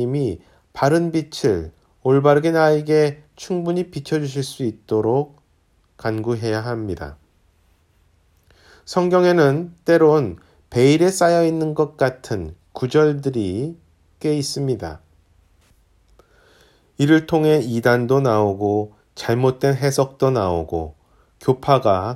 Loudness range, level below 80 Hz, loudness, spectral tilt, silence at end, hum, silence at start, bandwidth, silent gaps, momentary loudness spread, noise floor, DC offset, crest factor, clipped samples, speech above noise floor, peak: 9 LU; -50 dBFS; -19 LUFS; -6.5 dB/octave; 0 s; none; 0 s; 15.5 kHz; none; 13 LU; -60 dBFS; under 0.1%; 18 dB; under 0.1%; 42 dB; 0 dBFS